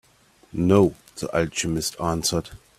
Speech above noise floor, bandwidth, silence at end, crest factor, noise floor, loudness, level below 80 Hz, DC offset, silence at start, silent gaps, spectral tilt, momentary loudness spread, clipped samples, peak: 35 dB; 16 kHz; 0.25 s; 20 dB; -57 dBFS; -23 LUFS; -48 dBFS; under 0.1%; 0.55 s; none; -5 dB/octave; 11 LU; under 0.1%; -4 dBFS